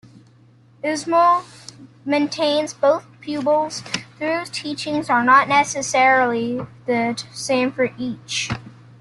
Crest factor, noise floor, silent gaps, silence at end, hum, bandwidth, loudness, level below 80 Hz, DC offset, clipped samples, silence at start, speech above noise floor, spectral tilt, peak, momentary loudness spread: 18 dB; -51 dBFS; none; 0.3 s; none; 12 kHz; -20 LUFS; -58 dBFS; under 0.1%; under 0.1%; 0.15 s; 32 dB; -3.5 dB/octave; -2 dBFS; 13 LU